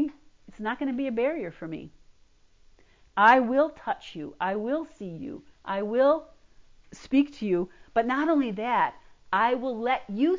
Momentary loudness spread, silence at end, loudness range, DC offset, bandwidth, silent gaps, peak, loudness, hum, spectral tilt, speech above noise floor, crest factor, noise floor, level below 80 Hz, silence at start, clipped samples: 17 LU; 0 s; 3 LU; under 0.1%; 7.6 kHz; none; -6 dBFS; -26 LUFS; none; -6.5 dB/octave; 33 dB; 20 dB; -59 dBFS; -62 dBFS; 0 s; under 0.1%